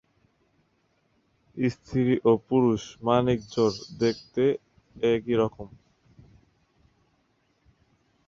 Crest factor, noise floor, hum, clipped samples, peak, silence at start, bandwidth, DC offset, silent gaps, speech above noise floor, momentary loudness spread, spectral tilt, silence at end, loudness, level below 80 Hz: 20 dB; -70 dBFS; none; under 0.1%; -8 dBFS; 1.55 s; 7.6 kHz; under 0.1%; none; 45 dB; 7 LU; -7 dB/octave; 2.6 s; -26 LUFS; -58 dBFS